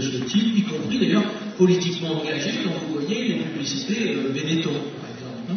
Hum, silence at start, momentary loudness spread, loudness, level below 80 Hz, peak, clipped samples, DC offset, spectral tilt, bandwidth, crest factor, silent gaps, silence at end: none; 0 s; 8 LU; -23 LUFS; -66 dBFS; -6 dBFS; under 0.1%; under 0.1%; -5 dB/octave; 6.6 kHz; 18 dB; none; 0 s